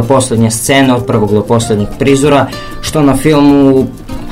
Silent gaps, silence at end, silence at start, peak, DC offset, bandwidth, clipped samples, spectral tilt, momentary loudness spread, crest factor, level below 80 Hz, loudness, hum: none; 0 s; 0 s; 0 dBFS; under 0.1%; 16 kHz; 0.9%; -5.5 dB/octave; 9 LU; 10 dB; -30 dBFS; -9 LUFS; none